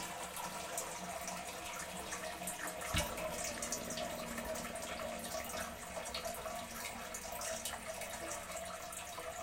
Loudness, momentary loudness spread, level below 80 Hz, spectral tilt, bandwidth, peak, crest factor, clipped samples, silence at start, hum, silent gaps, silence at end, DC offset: -42 LUFS; 5 LU; -58 dBFS; -2 dB/octave; 17 kHz; -20 dBFS; 24 dB; under 0.1%; 0 s; none; none; 0 s; under 0.1%